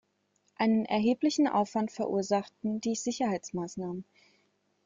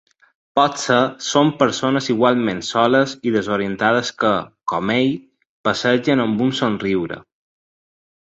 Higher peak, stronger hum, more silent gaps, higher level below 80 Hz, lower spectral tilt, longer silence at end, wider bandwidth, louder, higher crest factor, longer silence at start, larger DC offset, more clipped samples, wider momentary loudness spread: second, -16 dBFS vs -2 dBFS; first, 50 Hz at -55 dBFS vs none; second, none vs 5.49-5.64 s; second, -72 dBFS vs -56 dBFS; about the same, -5 dB/octave vs -5 dB/octave; second, 0.85 s vs 1.1 s; about the same, 7.6 kHz vs 8.2 kHz; second, -30 LUFS vs -18 LUFS; about the same, 16 dB vs 18 dB; about the same, 0.6 s vs 0.55 s; neither; neither; first, 10 LU vs 7 LU